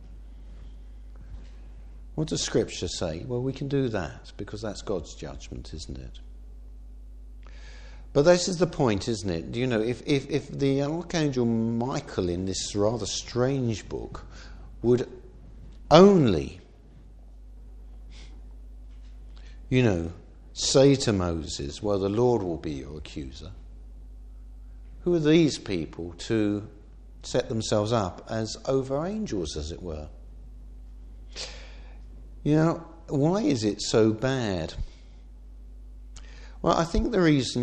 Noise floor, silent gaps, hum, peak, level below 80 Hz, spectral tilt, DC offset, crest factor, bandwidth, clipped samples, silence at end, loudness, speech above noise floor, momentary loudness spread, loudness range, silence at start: -49 dBFS; none; none; -2 dBFS; -44 dBFS; -5.5 dB/octave; under 0.1%; 24 dB; 10 kHz; under 0.1%; 0 s; -26 LUFS; 24 dB; 25 LU; 9 LU; 0 s